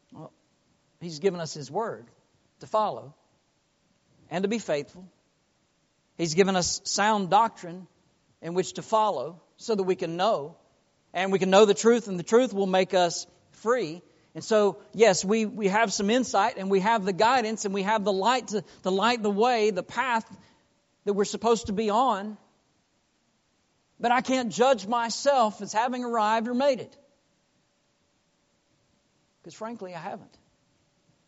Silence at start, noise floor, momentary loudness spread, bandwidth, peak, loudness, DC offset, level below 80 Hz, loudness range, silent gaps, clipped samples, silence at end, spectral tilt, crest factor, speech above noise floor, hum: 0.1 s; -70 dBFS; 16 LU; 8 kHz; -4 dBFS; -25 LUFS; under 0.1%; -66 dBFS; 9 LU; none; under 0.1%; 1.05 s; -3.5 dB/octave; 22 dB; 45 dB; none